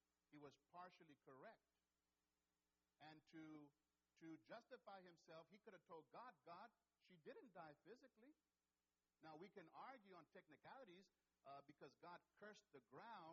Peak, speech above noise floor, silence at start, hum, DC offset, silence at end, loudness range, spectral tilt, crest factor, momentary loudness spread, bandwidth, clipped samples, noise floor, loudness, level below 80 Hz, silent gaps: -48 dBFS; over 25 dB; 0.3 s; none; under 0.1%; 0 s; 3 LU; -3.5 dB/octave; 18 dB; 6 LU; 6.4 kHz; under 0.1%; under -90 dBFS; -65 LUFS; under -90 dBFS; none